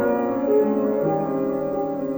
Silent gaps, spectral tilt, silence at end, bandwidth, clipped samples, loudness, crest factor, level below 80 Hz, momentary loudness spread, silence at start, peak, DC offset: none; -9.5 dB/octave; 0 s; over 20 kHz; under 0.1%; -22 LUFS; 12 dB; -56 dBFS; 5 LU; 0 s; -10 dBFS; under 0.1%